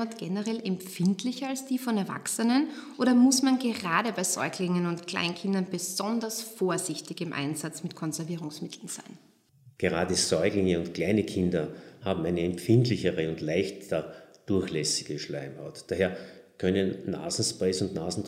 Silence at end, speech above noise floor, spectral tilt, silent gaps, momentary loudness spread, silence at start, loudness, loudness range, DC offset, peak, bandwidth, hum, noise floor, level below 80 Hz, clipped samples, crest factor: 0 s; 30 dB; -4.5 dB/octave; none; 11 LU; 0 s; -29 LUFS; 6 LU; under 0.1%; -10 dBFS; 16 kHz; none; -59 dBFS; -68 dBFS; under 0.1%; 20 dB